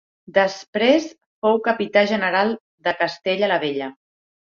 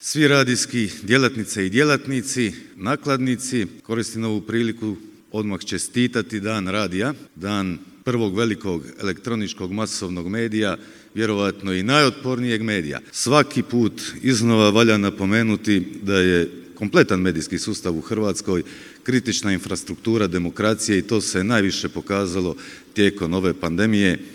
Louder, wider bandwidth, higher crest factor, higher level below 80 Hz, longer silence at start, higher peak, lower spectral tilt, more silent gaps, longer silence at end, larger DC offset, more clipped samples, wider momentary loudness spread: about the same, -20 LUFS vs -21 LUFS; second, 7.4 kHz vs 16 kHz; about the same, 18 dB vs 22 dB; second, -66 dBFS vs -56 dBFS; first, 0.3 s vs 0 s; about the same, -2 dBFS vs 0 dBFS; about the same, -4.5 dB/octave vs -4.5 dB/octave; first, 0.68-0.73 s, 1.26-1.42 s, 2.60-2.78 s vs none; first, 0.6 s vs 0 s; neither; neither; about the same, 8 LU vs 10 LU